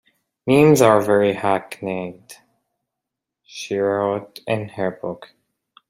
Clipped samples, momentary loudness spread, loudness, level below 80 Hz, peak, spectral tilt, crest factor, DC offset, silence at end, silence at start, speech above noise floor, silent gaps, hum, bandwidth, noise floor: under 0.1%; 18 LU; -19 LUFS; -60 dBFS; -2 dBFS; -6 dB/octave; 20 dB; under 0.1%; 0.65 s; 0.45 s; 65 dB; none; none; 16 kHz; -83 dBFS